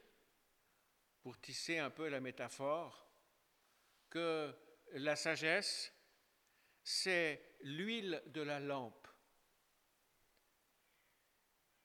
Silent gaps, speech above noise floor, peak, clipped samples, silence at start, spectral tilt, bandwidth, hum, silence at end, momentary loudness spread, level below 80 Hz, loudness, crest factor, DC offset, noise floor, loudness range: none; 37 dB; -22 dBFS; under 0.1%; 1.25 s; -3 dB/octave; 19 kHz; none; 2.75 s; 17 LU; -88 dBFS; -41 LUFS; 24 dB; under 0.1%; -79 dBFS; 8 LU